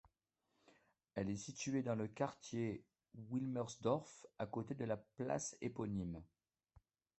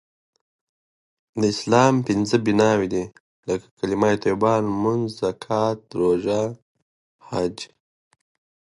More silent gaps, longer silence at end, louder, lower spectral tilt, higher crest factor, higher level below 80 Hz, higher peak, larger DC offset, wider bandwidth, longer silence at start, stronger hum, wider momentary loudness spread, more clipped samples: second, none vs 3.20-3.43 s, 3.71-3.77 s, 6.62-6.75 s, 6.82-7.19 s; about the same, 0.95 s vs 1 s; second, -44 LUFS vs -22 LUFS; about the same, -6 dB/octave vs -6 dB/octave; about the same, 20 dB vs 20 dB; second, -70 dBFS vs -56 dBFS; second, -24 dBFS vs -2 dBFS; neither; second, 8.2 kHz vs 11.5 kHz; second, 1.15 s vs 1.35 s; neither; about the same, 10 LU vs 11 LU; neither